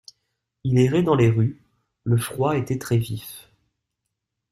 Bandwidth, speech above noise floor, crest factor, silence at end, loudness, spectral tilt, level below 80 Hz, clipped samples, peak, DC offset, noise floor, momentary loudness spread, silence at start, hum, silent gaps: 14.5 kHz; 60 dB; 18 dB; 1.1 s; -22 LUFS; -7 dB/octave; -54 dBFS; under 0.1%; -6 dBFS; under 0.1%; -81 dBFS; 15 LU; 0.65 s; none; none